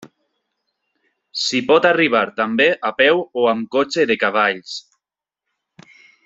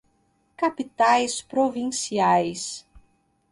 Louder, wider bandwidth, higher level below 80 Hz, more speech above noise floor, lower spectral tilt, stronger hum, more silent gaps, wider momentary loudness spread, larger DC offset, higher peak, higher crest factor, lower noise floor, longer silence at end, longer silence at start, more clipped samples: first, -17 LUFS vs -23 LUFS; second, 8 kHz vs 11.5 kHz; about the same, -64 dBFS vs -62 dBFS; first, 69 dB vs 44 dB; about the same, -3.5 dB/octave vs -3.5 dB/octave; neither; neither; about the same, 10 LU vs 11 LU; neither; first, 0 dBFS vs -6 dBFS; about the same, 18 dB vs 18 dB; first, -86 dBFS vs -67 dBFS; first, 1.45 s vs 0.5 s; second, 0 s vs 0.6 s; neither